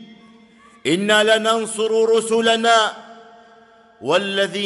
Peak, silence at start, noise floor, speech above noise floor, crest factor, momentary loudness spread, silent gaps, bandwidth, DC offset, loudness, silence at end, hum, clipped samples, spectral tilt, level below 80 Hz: -2 dBFS; 0 s; -49 dBFS; 32 dB; 18 dB; 9 LU; none; 12 kHz; under 0.1%; -17 LUFS; 0 s; none; under 0.1%; -3 dB/octave; -68 dBFS